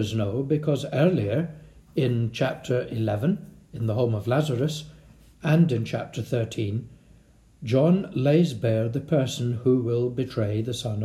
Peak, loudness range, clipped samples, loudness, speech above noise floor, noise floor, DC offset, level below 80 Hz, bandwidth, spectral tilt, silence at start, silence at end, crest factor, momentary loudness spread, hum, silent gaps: -8 dBFS; 3 LU; under 0.1%; -25 LUFS; 31 dB; -55 dBFS; under 0.1%; -56 dBFS; 14.5 kHz; -7.5 dB/octave; 0 s; 0 s; 16 dB; 9 LU; none; none